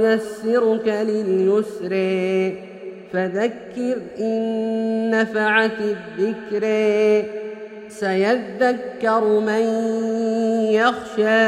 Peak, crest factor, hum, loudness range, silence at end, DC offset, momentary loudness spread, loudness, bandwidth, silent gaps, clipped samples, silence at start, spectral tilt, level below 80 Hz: -2 dBFS; 18 dB; none; 3 LU; 0 s; under 0.1%; 8 LU; -20 LUFS; 11.5 kHz; none; under 0.1%; 0 s; -6 dB/octave; -64 dBFS